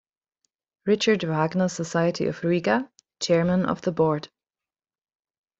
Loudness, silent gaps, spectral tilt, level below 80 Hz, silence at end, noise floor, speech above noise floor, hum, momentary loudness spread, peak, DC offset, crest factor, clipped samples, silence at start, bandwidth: -24 LUFS; none; -5.5 dB/octave; -62 dBFS; 1.35 s; under -90 dBFS; over 67 dB; none; 7 LU; -8 dBFS; under 0.1%; 18 dB; under 0.1%; 0.85 s; 8 kHz